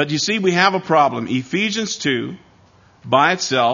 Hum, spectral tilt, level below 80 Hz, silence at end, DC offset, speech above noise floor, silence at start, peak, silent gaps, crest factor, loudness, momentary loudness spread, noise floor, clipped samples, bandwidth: none; -4 dB/octave; -62 dBFS; 0 s; under 0.1%; 33 dB; 0 s; 0 dBFS; none; 18 dB; -17 LUFS; 7 LU; -51 dBFS; under 0.1%; 7.4 kHz